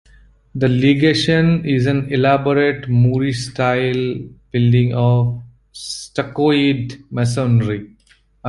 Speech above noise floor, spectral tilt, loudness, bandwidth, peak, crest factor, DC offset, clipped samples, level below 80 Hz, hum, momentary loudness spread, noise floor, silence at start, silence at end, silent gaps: 38 dB; -6.5 dB/octave; -17 LUFS; 11.5 kHz; -2 dBFS; 14 dB; under 0.1%; under 0.1%; -46 dBFS; none; 11 LU; -54 dBFS; 0.55 s; 0 s; none